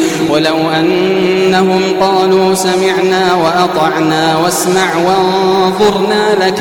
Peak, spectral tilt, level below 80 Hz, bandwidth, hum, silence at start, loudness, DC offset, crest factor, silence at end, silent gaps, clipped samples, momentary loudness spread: 0 dBFS; -4.5 dB/octave; -46 dBFS; 17 kHz; none; 0 s; -10 LUFS; 0.1%; 10 dB; 0 s; none; under 0.1%; 2 LU